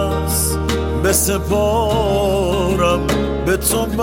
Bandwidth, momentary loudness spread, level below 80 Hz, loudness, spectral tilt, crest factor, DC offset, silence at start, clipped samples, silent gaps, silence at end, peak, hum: 17 kHz; 3 LU; -26 dBFS; -17 LUFS; -4.5 dB/octave; 14 dB; under 0.1%; 0 s; under 0.1%; none; 0 s; -2 dBFS; none